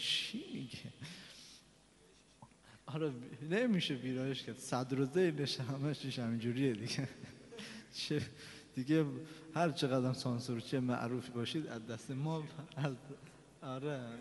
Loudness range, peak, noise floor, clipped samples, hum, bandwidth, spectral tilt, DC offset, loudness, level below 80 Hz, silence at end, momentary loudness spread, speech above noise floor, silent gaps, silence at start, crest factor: 5 LU; -20 dBFS; -65 dBFS; under 0.1%; none; 11.5 kHz; -5.5 dB/octave; under 0.1%; -39 LUFS; -74 dBFS; 0 s; 16 LU; 28 dB; none; 0 s; 20 dB